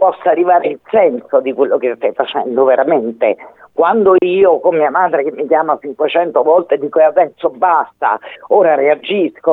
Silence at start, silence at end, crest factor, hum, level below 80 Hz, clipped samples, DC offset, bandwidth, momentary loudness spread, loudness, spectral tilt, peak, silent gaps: 0 s; 0 s; 12 dB; none; -62 dBFS; under 0.1%; under 0.1%; 4 kHz; 6 LU; -13 LUFS; -8 dB/octave; 0 dBFS; none